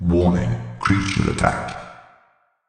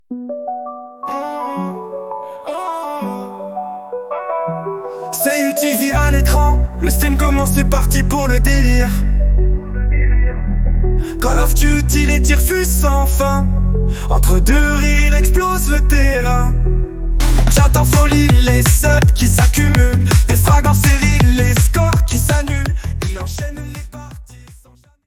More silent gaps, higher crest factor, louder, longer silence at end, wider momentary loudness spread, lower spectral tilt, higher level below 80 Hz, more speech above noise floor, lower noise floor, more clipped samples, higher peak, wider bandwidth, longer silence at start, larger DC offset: neither; first, 18 dB vs 12 dB; second, -21 LUFS vs -15 LUFS; first, 0.7 s vs 0.55 s; about the same, 15 LU vs 14 LU; first, -6.5 dB/octave vs -5 dB/octave; second, -38 dBFS vs -16 dBFS; first, 40 dB vs 36 dB; first, -60 dBFS vs -47 dBFS; neither; about the same, -2 dBFS vs 0 dBFS; second, 9.8 kHz vs 18 kHz; about the same, 0 s vs 0.1 s; neither